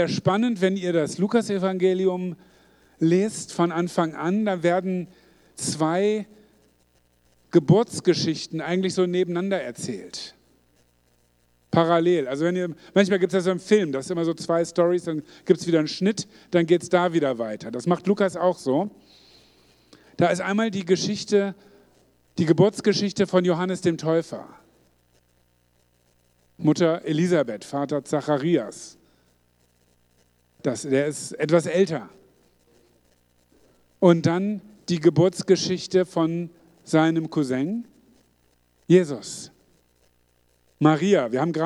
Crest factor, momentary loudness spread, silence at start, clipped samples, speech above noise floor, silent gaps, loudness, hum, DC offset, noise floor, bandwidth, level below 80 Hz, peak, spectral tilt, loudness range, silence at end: 20 dB; 12 LU; 0 s; under 0.1%; 42 dB; none; -23 LUFS; 60 Hz at -55 dBFS; under 0.1%; -64 dBFS; 12 kHz; -66 dBFS; -4 dBFS; -6 dB/octave; 5 LU; 0 s